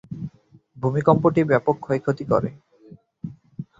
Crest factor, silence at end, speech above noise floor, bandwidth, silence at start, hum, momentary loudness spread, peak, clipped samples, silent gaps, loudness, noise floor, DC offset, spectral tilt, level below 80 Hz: 20 dB; 0.15 s; 33 dB; 7.8 kHz; 0.1 s; none; 20 LU; -2 dBFS; under 0.1%; none; -21 LUFS; -53 dBFS; under 0.1%; -9 dB/octave; -56 dBFS